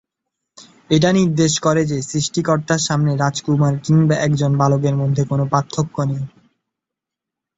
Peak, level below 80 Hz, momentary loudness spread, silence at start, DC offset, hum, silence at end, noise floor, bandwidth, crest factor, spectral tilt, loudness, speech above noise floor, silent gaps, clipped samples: -2 dBFS; -52 dBFS; 6 LU; 0.6 s; under 0.1%; none; 1.3 s; -84 dBFS; 8 kHz; 16 dB; -5.5 dB/octave; -17 LUFS; 68 dB; none; under 0.1%